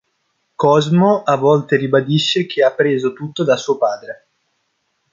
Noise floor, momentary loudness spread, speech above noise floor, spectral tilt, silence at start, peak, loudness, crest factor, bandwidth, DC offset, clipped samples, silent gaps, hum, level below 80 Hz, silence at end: -68 dBFS; 8 LU; 53 dB; -6 dB/octave; 0.6 s; -2 dBFS; -15 LUFS; 14 dB; 7.6 kHz; under 0.1%; under 0.1%; none; none; -62 dBFS; 1 s